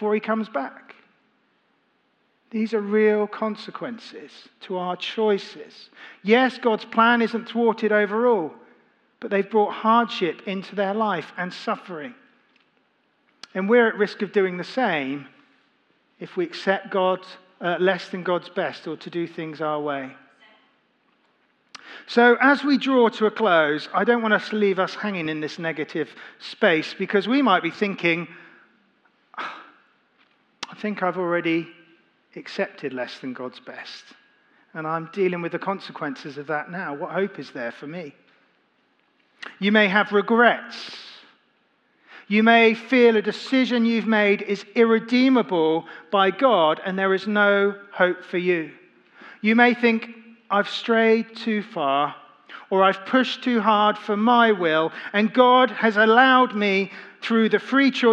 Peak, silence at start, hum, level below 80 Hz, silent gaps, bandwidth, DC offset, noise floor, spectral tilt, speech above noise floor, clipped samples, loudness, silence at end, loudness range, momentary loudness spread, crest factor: -2 dBFS; 0 s; none; -88 dBFS; none; 8.4 kHz; under 0.1%; -67 dBFS; -6 dB/octave; 45 dB; under 0.1%; -21 LUFS; 0 s; 11 LU; 17 LU; 22 dB